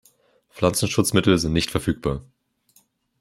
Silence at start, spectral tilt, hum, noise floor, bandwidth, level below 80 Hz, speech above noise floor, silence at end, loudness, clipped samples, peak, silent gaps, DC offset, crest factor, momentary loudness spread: 0.55 s; -5 dB/octave; none; -62 dBFS; 16 kHz; -44 dBFS; 41 dB; 1 s; -21 LUFS; under 0.1%; -2 dBFS; none; under 0.1%; 22 dB; 8 LU